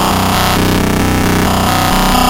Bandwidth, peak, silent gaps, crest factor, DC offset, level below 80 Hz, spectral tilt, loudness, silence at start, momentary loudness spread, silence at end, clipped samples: 16 kHz; 0 dBFS; none; 10 dB; under 0.1%; -22 dBFS; -4.5 dB/octave; -11 LUFS; 0 s; 1 LU; 0 s; under 0.1%